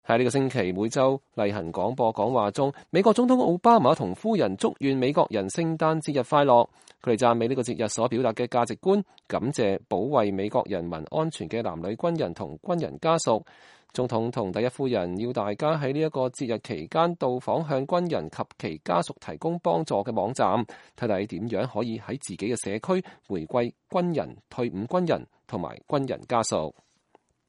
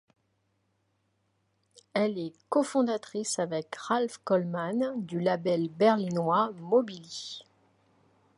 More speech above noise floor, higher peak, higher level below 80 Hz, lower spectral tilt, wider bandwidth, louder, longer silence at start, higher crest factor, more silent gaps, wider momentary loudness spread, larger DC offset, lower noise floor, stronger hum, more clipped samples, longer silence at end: second, 39 dB vs 46 dB; first, -6 dBFS vs -10 dBFS; first, -62 dBFS vs -80 dBFS; about the same, -6 dB/octave vs -5.5 dB/octave; about the same, 11.5 kHz vs 11.5 kHz; first, -26 LUFS vs -29 LUFS; second, 0.1 s vs 1.95 s; about the same, 20 dB vs 20 dB; neither; about the same, 10 LU vs 12 LU; neither; second, -64 dBFS vs -75 dBFS; neither; neither; second, 0.8 s vs 0.95 s